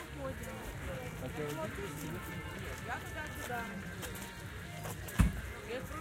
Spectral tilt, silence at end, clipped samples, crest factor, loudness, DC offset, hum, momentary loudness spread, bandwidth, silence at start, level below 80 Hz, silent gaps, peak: -5 dB/octave; 0 s; under 0.1%; 26 dB; -40 LUFS; under 0.1%; none; 10 LU; 17 kHz; 0 s; -46 dBFS; none; -14 dBFS